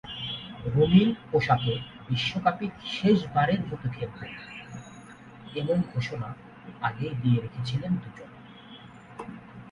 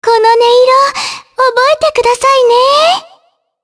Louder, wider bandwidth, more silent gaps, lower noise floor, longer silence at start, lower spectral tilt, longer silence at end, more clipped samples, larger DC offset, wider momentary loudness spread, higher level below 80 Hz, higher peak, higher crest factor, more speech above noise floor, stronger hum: second, -27 LUFS vs -9 LUFS; second, 8.8 kHz vs 11 kHz; neither; about the same, -47 dBFS vs -49 dBFS; about the same, 0.05 s vs 0 s; first, -7.5 dB/octave vs -0.5 dB/octave; second, 0 s vs 0.6 s; neither; neither; first, 23 LU vs 7 LU; second, -54 dBFS vs -48 dBFS; second, -8 dBFS vs 0 dBFS; first, 20 dB vs 10 dB; second, 21 dB vs 41 dB; neither